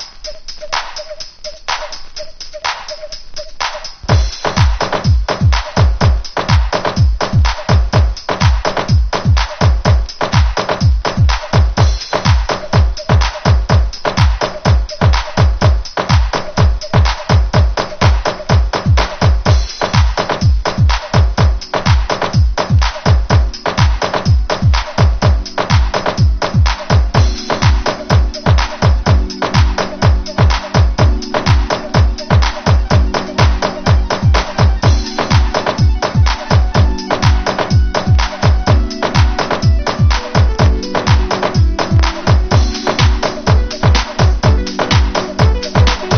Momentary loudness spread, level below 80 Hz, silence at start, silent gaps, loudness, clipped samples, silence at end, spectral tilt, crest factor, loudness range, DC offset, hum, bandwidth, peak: 5 LU; -16 dBFS; 0 s; none; -14 LUFS; under 0.1%; 0 s; -5.5 dB/octave; 12 dB; 1 LU; under 0.1%; none; 6.8 kHz; 0 dBFS